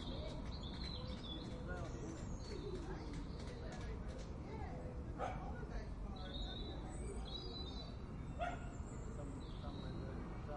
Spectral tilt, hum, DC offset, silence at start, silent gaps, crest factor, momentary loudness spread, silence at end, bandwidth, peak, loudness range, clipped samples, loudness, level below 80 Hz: -6 dB/octave; none; under 0.1%; 0 s; none; 16 dB; 4 LU; 0 s; 11 kHz; -30 dBFS; 1 LU; under 0.1%; -48 LUFS; -50 dBFS